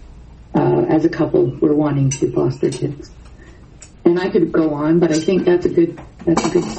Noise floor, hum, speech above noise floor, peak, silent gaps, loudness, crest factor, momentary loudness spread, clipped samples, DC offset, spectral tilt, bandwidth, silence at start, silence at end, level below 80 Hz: -41 dBFS; none; 25 dB; 0 dBFS; none; -17 LUFS; 16 dB; 6 LU; under 0.1%; under 0.1%; -6.5 dB/octave; 8.8 kHz; 0 s; 0 s; -42 dBFS